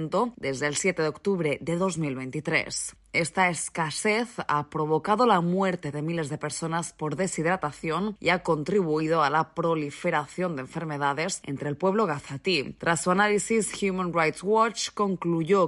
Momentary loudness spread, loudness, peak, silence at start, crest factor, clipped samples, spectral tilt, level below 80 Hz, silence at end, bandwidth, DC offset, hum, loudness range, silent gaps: 8 LU; -26 LUFS; -8 dBFS; 0 s; 18 dB; under 0.1%; -4.5 dB/octave; -60 dBFS; 0 s; 11.5 kHz; under 0.1%; none; 2 LU; none